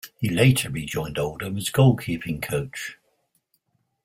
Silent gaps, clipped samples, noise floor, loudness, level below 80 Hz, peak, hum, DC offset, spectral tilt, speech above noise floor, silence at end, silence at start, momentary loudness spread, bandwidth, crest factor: none; under 0.1%; -70 dBFS; -23 LUFS; -50 dBFS; -4 dBFS; none; under 0.1%; -5.5 dB/octave; 48 dB; 1.1 s; 0.05 s; 11 LU; 16.5 kHz; 20 dB